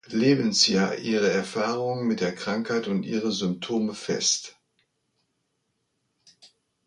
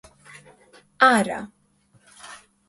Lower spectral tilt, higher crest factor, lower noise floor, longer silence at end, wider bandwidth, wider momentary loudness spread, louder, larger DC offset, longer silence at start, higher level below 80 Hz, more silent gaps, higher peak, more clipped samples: about the same, -3.5 dB/octave vs -3.5 dB/octave; about the same, 22 dB vs 22 dB; first, -76 dBFS vs -61 dBFS; about the same, 0.4 s vs 0.35 s; about the same, 11 kHz vs 11.5 kHz; second, 8 LU vs 25 LU; second, -25 LUFS vs -20 LUFS; neither; second, 0.1 s vs 1 s; about the same, -68 dBFS vs -64 dBFS; neither; about the same, -6 dBFS vs -4 dBFS; neither